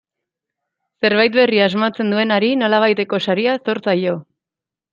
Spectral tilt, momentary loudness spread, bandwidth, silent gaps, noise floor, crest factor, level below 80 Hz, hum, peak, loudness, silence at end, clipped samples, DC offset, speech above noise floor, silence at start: -6.5 dB/octave; 6 LU; 7.4 kHz; none; -87 dBFS; 16 dB; -66 dBFS; none; -2 dBFS; -16 LUFS; 0.7 s; under 0.1%; under 0.1%; 71 dB; 1 s